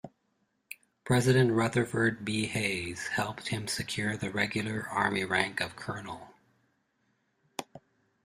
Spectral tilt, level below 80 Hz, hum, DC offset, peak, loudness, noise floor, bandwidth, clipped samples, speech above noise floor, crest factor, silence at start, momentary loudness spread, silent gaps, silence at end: -5 dB/octave; -62 dBFS; none; under 0.1%; -8 dBFS; -30 LUFS; -76 dBFS; 15.5 kHz; under 0.1%; 46 dB; 24 dB; 0.05 s; 18 LU; none; 0.45 s